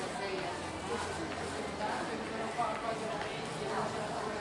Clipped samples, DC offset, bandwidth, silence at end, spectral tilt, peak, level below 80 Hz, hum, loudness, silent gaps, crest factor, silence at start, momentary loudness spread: under 0.1%; under 0.1%; 11.5 kHz; 0 s; -4 dB/octave; -22 dBFS; -62 dBFS; none; -37 LUFS; none; 14 dB; 0 s; 3 LU